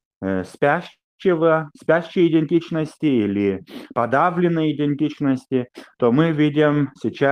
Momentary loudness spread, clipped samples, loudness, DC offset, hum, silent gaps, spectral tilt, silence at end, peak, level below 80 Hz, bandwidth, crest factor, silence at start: 8 LU; under 0.1%; -20 LUFS; under 0.1%; none; 1.04-1.18 s; -8 dB/octave; 0 s; -4 dBFS; -62 dBFS; 10.5 kHz; 16 dB; 0.2 s